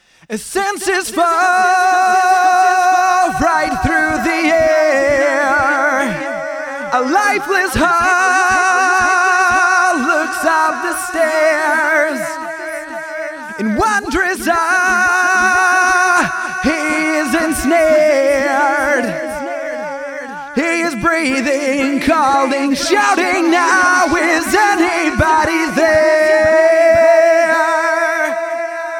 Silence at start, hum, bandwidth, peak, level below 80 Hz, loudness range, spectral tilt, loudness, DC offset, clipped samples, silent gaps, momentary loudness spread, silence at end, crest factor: 0.3 s; none; 17.5 kHz; -2 dBFS; -40 dBFS; 5 LU; -3.5 dB/octave; -13 LUFS; under 0.1%; under 0.1%; none; 11 LU; 0 s; 12 dB